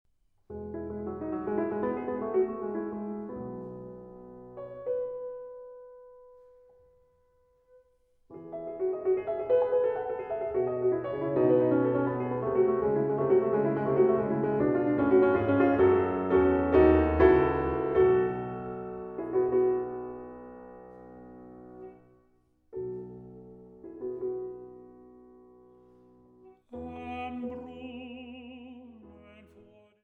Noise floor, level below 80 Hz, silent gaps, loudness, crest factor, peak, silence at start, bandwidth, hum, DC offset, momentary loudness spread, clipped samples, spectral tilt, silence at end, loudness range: -67 dBFS; -50 dBFS; none; -28 LUFS; 22 dB; -8 dBFS; 0.5 s; 3.8 kHz; none; under 0.1%; 24 LU; under 0.1%; -10.5 dB/octave; 0.9 s; 19 LU